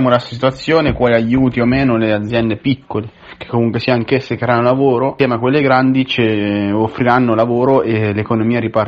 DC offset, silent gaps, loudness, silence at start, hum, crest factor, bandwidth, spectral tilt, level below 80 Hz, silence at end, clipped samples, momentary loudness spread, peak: under 0.1%; none; -14 LUFS; 0 s; none; 12 dB; 7.6 kHz; -8 dB/octave; -40 dBFS; 0 s; under 0.1%; 6 LU; 0 dBFS